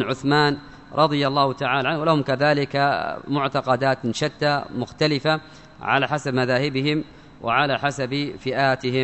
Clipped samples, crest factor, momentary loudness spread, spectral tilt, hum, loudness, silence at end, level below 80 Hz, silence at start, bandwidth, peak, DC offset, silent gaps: under 0.1%; 18 dB; 7 LU; -5.5 dB/octave; none; -22 LUFS; 0 s; -56 dBFS; 0 s; 8.4 kHz; -4 dBFS; 0.1%; none